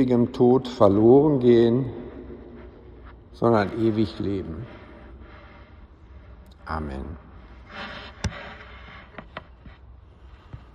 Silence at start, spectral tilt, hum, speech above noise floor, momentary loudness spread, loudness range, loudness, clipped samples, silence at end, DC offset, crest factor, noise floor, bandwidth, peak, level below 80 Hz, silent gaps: 0 s; -8 dB/octave; none; 28 dB; 25 LU; 18 LU; -21 LUFS; under 0.1%; 0.15 s; under 0.1%; 20 dB; -48 dBFS; 8.2 kHz; -4 dBFS; -46 dBFS; none